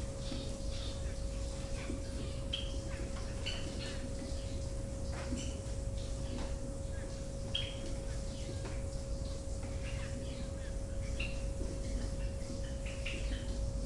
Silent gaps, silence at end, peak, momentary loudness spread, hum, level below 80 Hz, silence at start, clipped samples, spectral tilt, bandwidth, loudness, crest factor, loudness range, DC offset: none; 0 s; -22 dBFS; 3 LU; none; -42 dBFS; 0 s; under 0.1%; -5 dB/octave; 11.5 kHz; -41 LUFS; 18 dB; 1 LU; under 0.1%